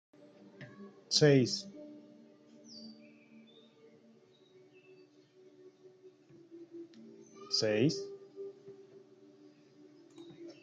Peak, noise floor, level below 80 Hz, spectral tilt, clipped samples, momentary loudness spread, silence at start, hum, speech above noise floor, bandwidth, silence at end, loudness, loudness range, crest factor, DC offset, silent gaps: -14 dBFS; -63 dBFS; -80 dBFS; -4.5 dB/octave; under 0.1%; 28 LU; 0.6 s; none; 35 dB; 9.4 kHz; 0.1 s; -30 LUFS; 23 LU; 24 dB; under 0.1%; none